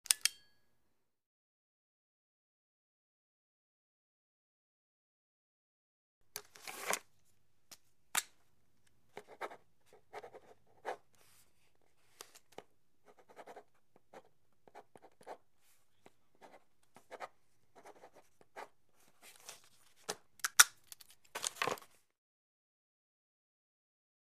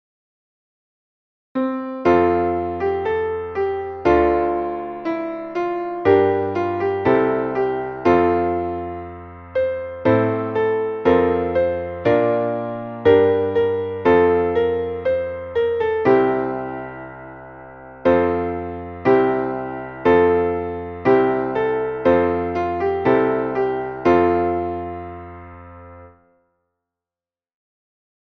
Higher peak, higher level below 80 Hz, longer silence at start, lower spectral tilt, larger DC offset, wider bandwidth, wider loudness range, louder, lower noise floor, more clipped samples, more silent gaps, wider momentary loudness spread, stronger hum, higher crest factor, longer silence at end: about the same, -4 dBFS vs -2 dBFS; second, -88 dBFS vs -46 dBFS; second, 0.1 s vs 1.55 s; second, 1.5 dB/octave vs -8.5 dB/octave; neither; first, 15.5 kHz vs 6.2 kHz; first, 25 LU vs 4 LU; second, -35 LUFS vs -19 LUFS; second, -81 dBFS vs under -90 dBFS; neither; first, 1.26-6.21 s vs none; first, 27 LU vs 13 LU; neither; first, 42 dB vs 18 dB; first, 2.45 s vs 2.15 s